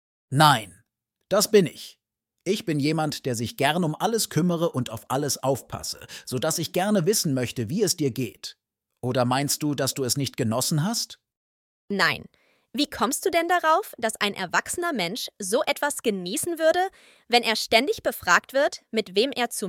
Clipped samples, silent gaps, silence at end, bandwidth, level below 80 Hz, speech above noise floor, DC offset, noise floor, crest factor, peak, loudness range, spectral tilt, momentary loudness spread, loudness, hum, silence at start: under 0.1%; 11.37-11.88 s; 0 s; 18 kHz; -64 dBFS; 48 dB; under 0.1%; -73 dBFS; 22 dB; -4 dBFS; 3 LU; -4 dB/octave; 11 LU; -24 LUFS; none; 0.3 s